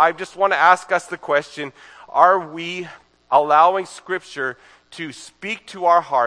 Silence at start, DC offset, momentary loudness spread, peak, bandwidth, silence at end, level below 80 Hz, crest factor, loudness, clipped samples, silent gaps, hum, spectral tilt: 0 s; under 0.1%; 17 LU; 0 dBFS; 10.5 kHz; 0 s; -70 dBFS; 20 dB; -18 LUFS; under 0.1%; none; none; -3.5 dB/octave